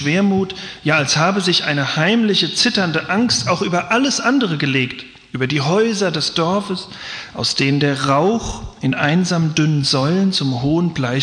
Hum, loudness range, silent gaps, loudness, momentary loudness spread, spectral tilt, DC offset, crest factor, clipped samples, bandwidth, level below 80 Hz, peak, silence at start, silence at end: none; 3 LU; none; -17 LUFS; 9 LU; -4.5 dB/octave; under 0.1%; 14 dB; under 0.1%; 10.5 kHz; -46 dBFS; -2 dBFS; 0 s; 0 s